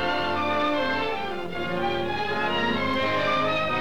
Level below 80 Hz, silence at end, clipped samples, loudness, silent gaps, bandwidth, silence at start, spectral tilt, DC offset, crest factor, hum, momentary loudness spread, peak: -50 dBFS; 0 s; under 0.1%; -25 LUFS; none; over 20 kHz; 0 s; -5.5 dB/octave; 1%; 12 dB; none; 6 LU; -14 dBFS